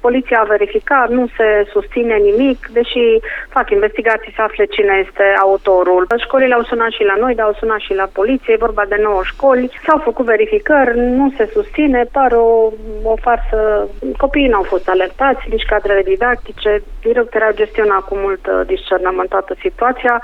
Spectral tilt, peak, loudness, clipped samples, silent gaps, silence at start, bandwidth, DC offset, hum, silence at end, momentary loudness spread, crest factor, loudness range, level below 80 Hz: -6.5 dB/octave; 0 dBFS; -14 LUFS; under 0.1%; none; 0.05 s; 4.5 kHz; under 0.1%; none; 0 s; 6 LU; 14 dB; 2 LU; -30 dBFS